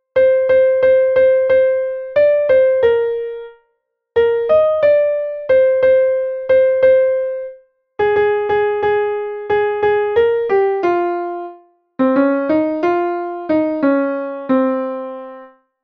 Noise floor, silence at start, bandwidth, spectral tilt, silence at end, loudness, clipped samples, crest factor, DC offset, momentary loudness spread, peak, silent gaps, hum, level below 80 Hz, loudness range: -68 dBFS; 0.15 s; 5 kHz; -7.5 dB/octave; 0.35 s; -15 LUFS; under 0.1%; 12 dB; under 0.1%; 11 LU; -2 dBFS; none; none; -52 dBFS; 4 LU